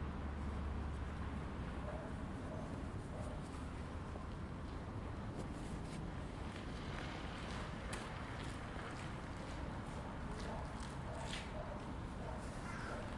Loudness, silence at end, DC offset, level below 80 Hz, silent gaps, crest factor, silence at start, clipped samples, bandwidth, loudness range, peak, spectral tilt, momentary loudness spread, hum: -47 LUFS; 0 s; under 0.1%; -50 dBFS; none; 16 dB; 0 s; under 0.1%; 11.5 kHz; 1 LU; -30 dBFS; -6 dB/octave; 3 LU; none